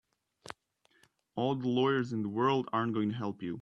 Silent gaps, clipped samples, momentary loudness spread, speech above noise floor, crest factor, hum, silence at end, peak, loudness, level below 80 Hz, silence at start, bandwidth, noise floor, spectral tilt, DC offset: none; under 0.1%; 20 LU; 40 dB; 16 dB; none; 0 s; -16 dBFS; -32 LUFS; -74 dBFS; 1.35 s; 10.5 kHz; -71 dBFS; -7 dB/octave; under 0.1%